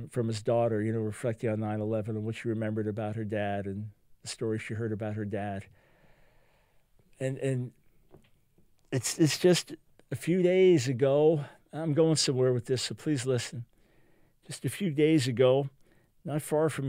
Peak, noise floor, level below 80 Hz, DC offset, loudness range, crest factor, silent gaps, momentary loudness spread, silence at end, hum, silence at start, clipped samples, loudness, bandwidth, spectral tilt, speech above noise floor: -12 dBFS; -65 dBFS; -68 dBFS; under 0.1%; 11 LU; 18 dB; none; 15 LU; 0 s; none; 0 s; under 0.1%; -29 LUFS; 16 kHz; -5.5 dB/octave; 37 dB